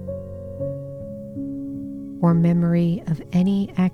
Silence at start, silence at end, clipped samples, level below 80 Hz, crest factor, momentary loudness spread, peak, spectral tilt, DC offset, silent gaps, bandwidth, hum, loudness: 0 s; 0 s; under 0.1%; -48 dBFS; 14 dB; 15 LU; -8 dBFS; -9.5 dB/octave; under 0.1%; none; 6 kHz; none; -22 LUFS